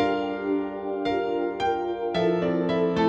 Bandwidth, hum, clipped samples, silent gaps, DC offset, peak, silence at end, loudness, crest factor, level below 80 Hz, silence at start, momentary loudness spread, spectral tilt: 7.8 kHz; none; under 0.1%; none; under 0.1%; -12 dBFS; 0 s; -26 LUFS; 14 dB; -56 dBFS; 0 s; 4 LU; -7 dB/octave